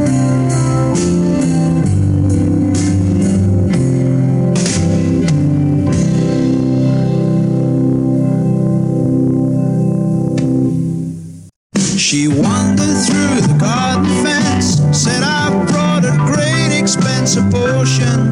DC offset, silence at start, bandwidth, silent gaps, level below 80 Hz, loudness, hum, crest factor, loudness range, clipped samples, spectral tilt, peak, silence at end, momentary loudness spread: under 0.1%; 0 s; 11.5 kHz; 11.56-11.70 s; -38 dBFS; -13 LUFS; none; 12 dB; 2 LU; under 0.1%; -5.5 dB/octave; -2 dBFS; 0 s; 2 LU